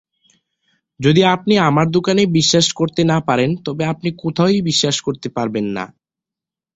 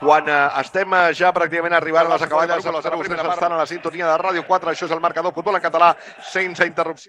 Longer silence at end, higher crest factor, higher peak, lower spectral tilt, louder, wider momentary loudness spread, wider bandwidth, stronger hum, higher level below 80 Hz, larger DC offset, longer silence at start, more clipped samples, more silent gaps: first, 0.9 s vs 0.05 s; about the same, 16 dB vs 18 dB; about the same, -2 dBFS vs 0 dBFS; about the same, -5 dB/octave vs -4.5 dB/octave; about the same, -16 LUFS vs -18 LUFS; about the same, 9 LU vs 8 LU; second, 8.2 kHz vs 10.5 kHz; neither; first, -52 dBFS vs -64 dBFS; neither; first, 1 s vs 0 s; neither; neither